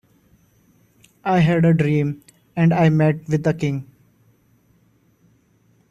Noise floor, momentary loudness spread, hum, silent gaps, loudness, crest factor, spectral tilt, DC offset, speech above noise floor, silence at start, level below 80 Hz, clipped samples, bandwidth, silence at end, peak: -59 dBFS; 14 LU; none; none; -19 LUFS; 16 dB; -8.5 dB/octave; under 0.1%; 42 dB; 1.25 s; -54 dBFS; under 0.1%; 7.6 kHz; 2.05 s; -6 dBFS